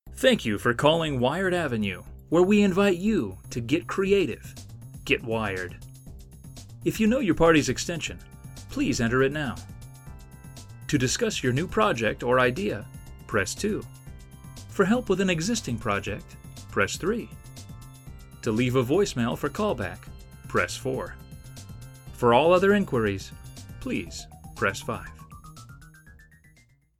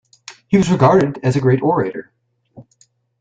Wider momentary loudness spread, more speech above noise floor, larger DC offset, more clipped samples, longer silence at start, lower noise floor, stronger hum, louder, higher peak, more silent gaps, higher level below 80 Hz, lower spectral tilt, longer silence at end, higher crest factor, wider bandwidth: first, 23 LU vs 9 LU; second, 35 dB vs 43 dB; neither; neither; second, 0.05 s vs 0.3 s; about the same, -60 dBFS vs -57 dBFS; neither; second, -25 LUFS vs -15 LUFS; about the same, -4 dBFS vs -2 dBFS; neither; about the same, -46 dBFS vs -50 dBFS; second, -5 dB/octave vs -7.5 dB/octave; first, 0.9 s vs 0.6 s; first, 22 dB vs 16 dB; first, 17 kHz vs 9 kHz